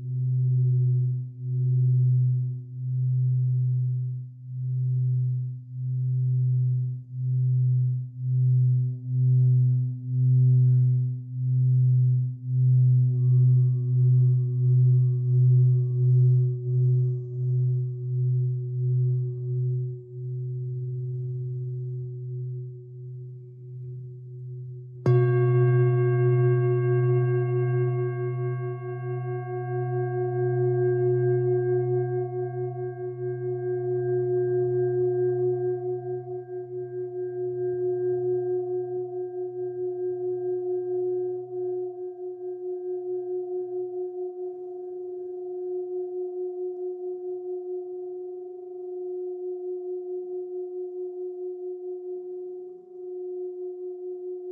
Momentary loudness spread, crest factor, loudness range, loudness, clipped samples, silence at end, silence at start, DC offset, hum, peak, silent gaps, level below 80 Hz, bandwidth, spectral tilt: 15 LU; 14 dB; 12 LU; -26 LUFS; under 0.1%; 0 s; 0 s; under 0.1%; none; -10 dBFS; none; -76 dBFS; 2.9 kHz; -13.5 dB/octave